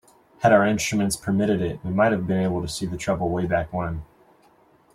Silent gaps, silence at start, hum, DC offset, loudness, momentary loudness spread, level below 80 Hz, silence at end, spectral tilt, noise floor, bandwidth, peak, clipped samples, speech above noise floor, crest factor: none; 0.4 s; none; under 0.1%; -23 LUFS; 10 LU; -48 dBFS; 0.9 s; -5.5 dB/octave; -57 dBFS; 15 kHz; -4 dBFS; under 0.1%; 35 dB; 20 dB